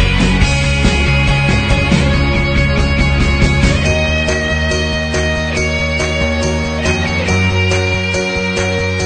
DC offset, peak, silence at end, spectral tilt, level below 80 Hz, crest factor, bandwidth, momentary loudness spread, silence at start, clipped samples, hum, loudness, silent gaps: under 0.1%; 0 dBFS; 0 s; -5 dB/octave; -20 dBFS; 14 dB; 9.4 kHz; 3 LU; 0 s; under 0.1%; none; -14 LUFS; none